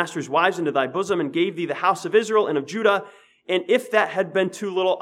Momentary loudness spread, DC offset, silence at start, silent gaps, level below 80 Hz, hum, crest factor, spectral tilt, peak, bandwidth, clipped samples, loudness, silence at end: 5 LU; under 0.1%; 0 s; none; -76 dBFS; none; 18 dB; -4.5 dB/octave; -4 dBFS; 14 kHz; under 0.1%; -22 LUFS; 0 s